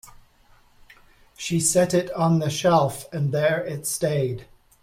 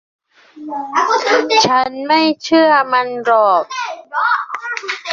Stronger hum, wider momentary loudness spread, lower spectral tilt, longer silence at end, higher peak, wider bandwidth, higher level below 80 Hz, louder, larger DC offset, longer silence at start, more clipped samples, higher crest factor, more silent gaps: neither; second, 8 LU vs 11 LU; first, -5 dB/octave vs -2.5 dB/octave; first, 0.4 s vs 0 s; second, -8 dBFS vs 0 dBFS; first, 16.5 kHz vs 7.6 kHz; first, -56 dBFS vs -64 dBFS; second, -23 LUFS vs -14 LUFS; neither; second, 0.05 s vs 0.55 s; neither; about the same, 16 dB vs 14 dB; neither